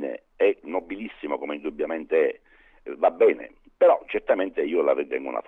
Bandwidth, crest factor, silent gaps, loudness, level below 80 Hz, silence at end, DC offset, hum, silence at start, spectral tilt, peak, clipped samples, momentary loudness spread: 3.9 kHz; 16 dB; none; -24 LUFS; -60 dBFS; 0.05 s; under 0.1%; none; 0 s; -7 dB/octave; -8 dBFS; under 0.1%; 15 LU